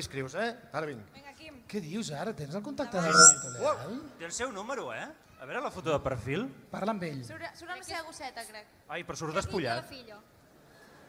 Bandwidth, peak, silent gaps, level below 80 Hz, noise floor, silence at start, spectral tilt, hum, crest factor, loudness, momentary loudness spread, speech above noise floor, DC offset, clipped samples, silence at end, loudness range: 16 kHz; -4 dBFS; none; -62 dBFS; -58 dBFS; 0 s; -2 dB/octave; none; 28 dB; -28 LUFS; 15 LU; 26 dB; under 0.1%; under 0.1%; 0.05 s; 13 LU